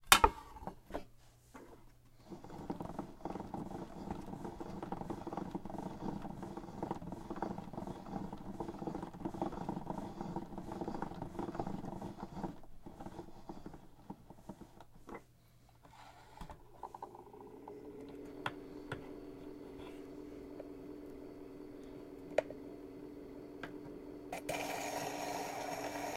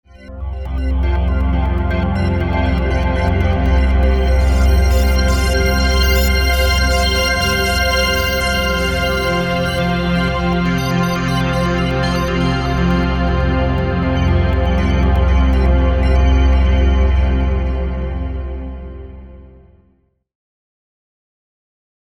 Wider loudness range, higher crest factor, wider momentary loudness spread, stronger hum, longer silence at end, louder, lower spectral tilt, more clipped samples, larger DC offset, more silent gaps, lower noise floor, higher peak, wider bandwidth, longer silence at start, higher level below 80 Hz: first, 10 LU vs 5 LU; first, 42 dB vs 12 dB; first, 14 LU vs 7 LU; neither; second, 0 s vs 2.6 s; second, -43 LUFS vs -16 LUFS; second, -3.5 dB/octave vs -5.5 dB/octave; neither; neither; neither; first, -64 dBFS vs -58 dBFS; about the same, -2 dBFS vs -2 dBFS; second, 16 kHz vs 18 kHz; second, 0 s vs 0.15 s; second, -56 dBFS vs -18 dBFS